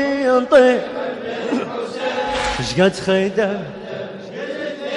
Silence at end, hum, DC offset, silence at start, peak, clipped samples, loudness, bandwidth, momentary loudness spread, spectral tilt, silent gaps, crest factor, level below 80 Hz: 0 s; none; under 0.1%; 0 s; -2 dBFS; under 0.1%; -18 LUFS; 11.5 kHz; 17 LU; -5 dB/octave; none; 16 dB; -44 dBFS